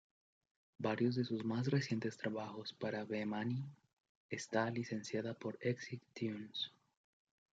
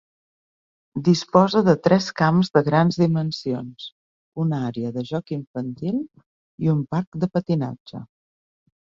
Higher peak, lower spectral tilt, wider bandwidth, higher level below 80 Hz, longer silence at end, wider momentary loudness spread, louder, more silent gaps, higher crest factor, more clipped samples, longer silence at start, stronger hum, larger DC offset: second, -22 dBFS vs -2 dBFS; about the same, -6 dB/octave vs -7 dB/octave; first, 9 kHz vs 7.4 kHz; second, -84 dBFS vs -60 dBFS; about the same, 0.9 s vs 0.85 s; second, 8 LU vs 18 LU; second, -41 LUFS vs -22 LUFS; second, 3.93-4.29 s vs 3.92-4.32 s, 5.47-5.54 s, 6.26-6.58 s, 7.07-7.12 s, 7.80-7.85 s; about the same, 20 dB vs 20 dB; neither; second, 0.8 s vs 0.95 s; neither; neither